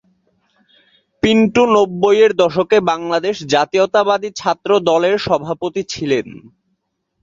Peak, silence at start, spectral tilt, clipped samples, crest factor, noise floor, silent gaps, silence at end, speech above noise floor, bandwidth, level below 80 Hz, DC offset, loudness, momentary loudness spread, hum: 0 dBFS; 1.25 s; -5 dB/octave; under 0.1%; 16 dB; -70 dBFS; none; 0.75 s; 55 dB; 7.6 kHz; -50 dBFS; under 0.1%; -15 LUFS; 8 LU; none